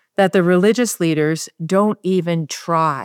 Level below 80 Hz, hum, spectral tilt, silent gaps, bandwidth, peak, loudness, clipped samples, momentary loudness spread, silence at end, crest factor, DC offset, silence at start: -70 dBFS; none; -5.5 dB/octave; none; 18 kHz; -2 dBFS; -17 LUFS; under 0.1%; 7 LU; 0 s; 14 dB; under 0.1%; 0.2 s